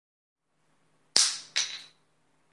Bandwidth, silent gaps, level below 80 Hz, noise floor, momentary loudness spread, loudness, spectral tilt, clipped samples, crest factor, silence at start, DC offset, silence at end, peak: 11.5 kHz; none; -88 dBFS; -72 dBFS; 11 LU; -26 LUFS; 3 dB/octave; under 0.1%; 32 dB; 1.15 s; under 0.1%; 0.65 s; -2 dBFS